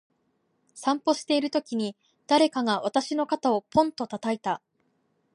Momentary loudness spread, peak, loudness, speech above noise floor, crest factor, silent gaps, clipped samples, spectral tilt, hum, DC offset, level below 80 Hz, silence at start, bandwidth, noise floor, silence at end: 9 LU; -8 dBFS; -26 LUFS; 47 dB; 20 dB; none; under 0.1%; -4 dB/octave; none; under 0.1%; -66 dBFS; 0.75 s; 11.5 kHz; -72 dBFS; 0.75 s